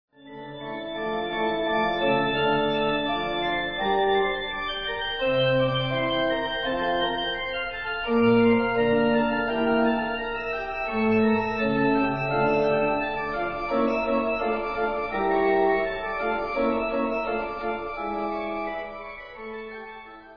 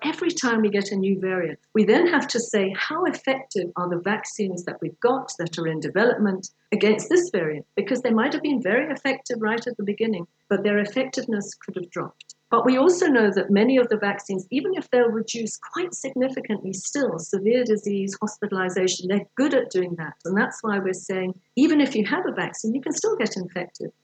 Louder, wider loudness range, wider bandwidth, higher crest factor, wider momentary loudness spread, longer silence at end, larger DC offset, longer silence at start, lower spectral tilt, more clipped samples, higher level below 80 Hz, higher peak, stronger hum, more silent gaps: about the same, -25 LUFS vs -23 LUFS; about the same, 3 LU vs 4 LU; second, 5.4 kHz vs 9.2 kHz; about the same, 16 dB vs 18 dB; about the same, 10 LU vs 10 LU; second, 0 s vs 0.15 s; neither; first, 0.25 s vs 0 s; first, -7.5 dB/octave vs -4.5 dB/octave; neither; first, -46 dBFS vs -82 dBFS; about the same, -8 dBFS vs -6 dBFS; neither; neither